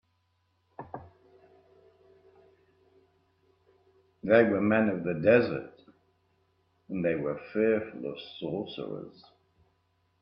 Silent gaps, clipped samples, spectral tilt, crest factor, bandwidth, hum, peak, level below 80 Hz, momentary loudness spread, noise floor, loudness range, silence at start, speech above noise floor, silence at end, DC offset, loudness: none; under 0.1%; -10 dB/octave; 24 dB; 5.6 kHz; none; -8 dBFS; -70 dBFS; 22 LU; -74 dBFS; 6 LU; 0.8 s; 46 dB; 1.1 s; under 0.1%; -28 LUFS